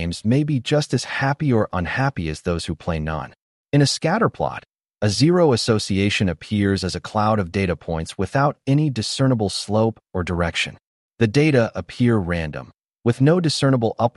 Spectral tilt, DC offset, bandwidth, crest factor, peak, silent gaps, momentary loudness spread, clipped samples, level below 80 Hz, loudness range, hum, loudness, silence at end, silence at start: -6 dB/octave; under 0.1%; 11.5 kHz; 16 dB; -4 dBFS; 3.42-3.65 s, 10.87-11.10 s; 9 LU; under 0.1%; -44 dBFS; 3 LU; none; -21 LUFS; 0.05 s; 0 s